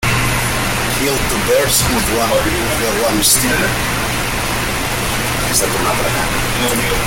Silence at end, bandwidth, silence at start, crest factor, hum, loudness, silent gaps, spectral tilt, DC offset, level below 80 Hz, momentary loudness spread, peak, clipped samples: 0 s; 17 kHz; 0 s; 16 dB; none; -15 LUFS; none; -3 dB/octave; under 0.1%; -28 dBFS; 5 LU; 0 dBFS; under 0.1%